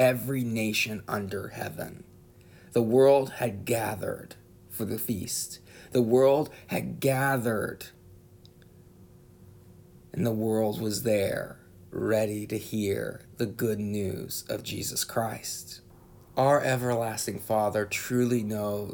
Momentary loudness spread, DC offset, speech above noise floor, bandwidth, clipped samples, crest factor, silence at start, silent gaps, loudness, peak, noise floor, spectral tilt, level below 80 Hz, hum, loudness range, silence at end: 13 LU; under 0.1%; 26 dB; over 20 kHz; under 0.1%; 18 dB; 0 s; none; -28 LUFS; -10 dBFS; -54 dBFS; -5 dB/octave; -62 dBFS; none; 5 LU; 0 s